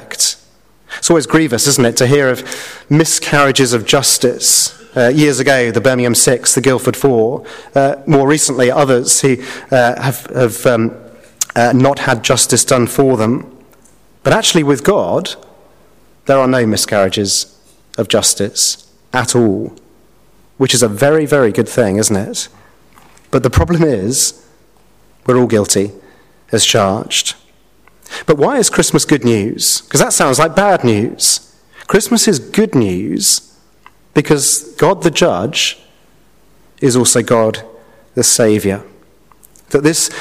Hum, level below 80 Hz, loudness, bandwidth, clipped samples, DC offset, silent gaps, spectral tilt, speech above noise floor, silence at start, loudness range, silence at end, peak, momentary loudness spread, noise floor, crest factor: none; -40 dBFS; -12 LUFS; 16 kHz; under 0.1%; 0.5%; none; -3.5 dB/octave; 38 dB; 0 s; 4 LU; 0 s; 0 dBFS; 9 LU; -50 dBFS; 14 dB